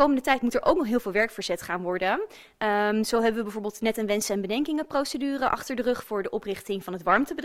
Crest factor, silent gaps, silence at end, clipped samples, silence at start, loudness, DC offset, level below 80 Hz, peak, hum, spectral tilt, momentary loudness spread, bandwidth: 20 dB; none; 0 s; under 0.1%; 0 s; -26 LUFS; under 0.1%; -54 dBFS; -6 dBFS; none; -4 dB/octave; 8 LU; 16 kHz